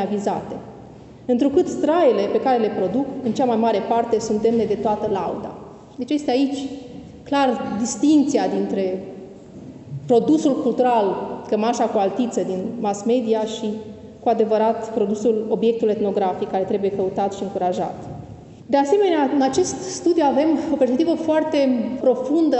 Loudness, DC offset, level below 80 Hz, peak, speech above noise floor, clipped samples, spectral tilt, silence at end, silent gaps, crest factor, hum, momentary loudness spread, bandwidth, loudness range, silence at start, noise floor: -20 LUFS; under 0.1%; -58 dBFS; -6 dBFS; 22 dB; under 0.1%; -5.5 dB/octave; 0 s; none; 14 dB; none; 17 LU; 8.4 kHz; 3 LU; 0 s; -41 dBFS